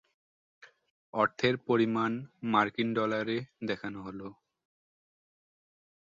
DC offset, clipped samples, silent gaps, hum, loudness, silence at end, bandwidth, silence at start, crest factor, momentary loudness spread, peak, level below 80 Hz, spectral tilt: under 0.1%; under 0.1%; 0.90-1.13 s; none; -31 LUFS; 1.7 s; 7.6 kHz; 0.65 s; 22 dB; 13 LU; -10 dBFS; -70 dBFS; -6.5 dB/octave